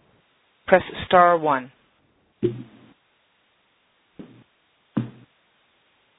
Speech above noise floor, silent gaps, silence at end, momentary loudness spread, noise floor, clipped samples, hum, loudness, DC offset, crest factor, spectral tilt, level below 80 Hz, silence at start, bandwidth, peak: 46 dB; none; 1.1 s; 22 LU; -65 dBFS; under 0.1%; none; -21 LUFS; under 0.1%; 26 dB; -9.5 dB/octave; -58 dBFS; 0.7 s; 4 kHz; 0 dBFS